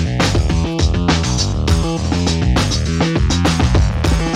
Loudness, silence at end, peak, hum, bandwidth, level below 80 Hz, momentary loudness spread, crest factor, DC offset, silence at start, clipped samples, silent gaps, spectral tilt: -16 LUFS; 0 s; -2 dBFS; none; 13 kHz; -20 dBFS; 2 LU; 14 dB; under 0.1%; 0 s; under 0.1%; none; -5 dB/octave